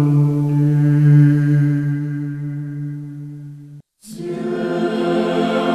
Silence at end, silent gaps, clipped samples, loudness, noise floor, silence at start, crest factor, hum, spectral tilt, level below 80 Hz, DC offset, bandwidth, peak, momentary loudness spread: 0 s; none; under 0.1%; -17 LUFS; -40 dBFS; 0 s; 14 dB; none; -9 dB/octave; -56 dBFS; under 0.1%; 9.4 kHz; -4 dBFS; 19 LU